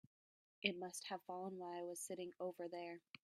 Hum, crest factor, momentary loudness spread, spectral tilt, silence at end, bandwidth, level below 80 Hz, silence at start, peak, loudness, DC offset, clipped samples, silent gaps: none; 28 dB; 7 LU; -3 dB/octave; 0.1 s; 15.5 kHz; under -90 dBFS; 0.6 s; -20 dBFS; -48 LUFS; under 0.1%; under 0.1%; 3.10-3.14 s